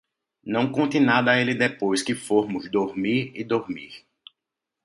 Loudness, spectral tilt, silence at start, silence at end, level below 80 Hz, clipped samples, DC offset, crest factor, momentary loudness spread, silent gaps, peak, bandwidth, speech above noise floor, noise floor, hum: -23 LUFS; -5 dB/octave; 0.45 s; 0.85 s; -66 dBFS; under 0.1%; under 0.1%; 20 dB; 11 LU; none; -4 dBFS; 11.5 kHz; 62 dB; -85 dBFS; none